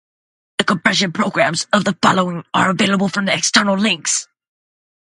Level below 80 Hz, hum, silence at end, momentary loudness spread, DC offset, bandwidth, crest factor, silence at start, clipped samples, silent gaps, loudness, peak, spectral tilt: -58 dBFS; none; 0.8 s; 5 LU; under 0.1%; 11.5 kHz; 18 dB; 0.6 s; under 0.1%; none; -16 LUFS; 0 dBFS; -3 dB/octave